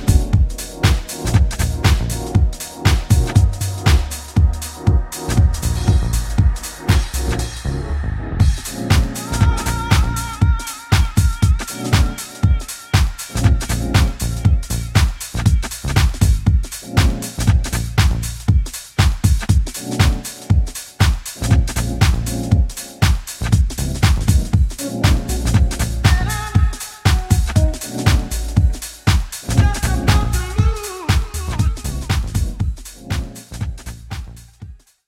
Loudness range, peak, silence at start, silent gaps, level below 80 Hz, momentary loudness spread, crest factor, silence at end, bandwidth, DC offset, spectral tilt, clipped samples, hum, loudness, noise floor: 2 LU; 0 dBFS; 0 s; none; -20 dBFS; 7 LU; 16 dB; 0.3 s; 16.5 kHz; under 0.1%; -5 dB/octave; under 0.1%; none; -18 LUFS; -38 dBFS